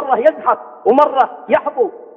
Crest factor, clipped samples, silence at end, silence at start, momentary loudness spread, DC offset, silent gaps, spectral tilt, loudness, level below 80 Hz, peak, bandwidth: 14 dB; under 0.1%; 0.1 s; 0 s; 6 LU; under 0.1%; none; -6.5 dB/octave; -15 LUFS; -64 dBFS; 0 dBFS; 6 kHz